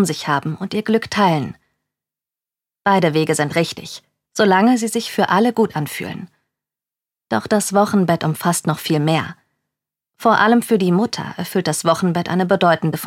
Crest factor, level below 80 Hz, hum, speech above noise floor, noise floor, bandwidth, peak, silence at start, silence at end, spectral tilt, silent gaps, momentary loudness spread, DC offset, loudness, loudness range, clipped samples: 16 dB; -62 dBFS; none; 72 dB; -89 dBFS; 17 kHz; -2 dBFS; 0 s; 0 s; -5 dB/octave; none; 11 LU; under 0.1%; -17 LUFS; 3 LU; under 0.1%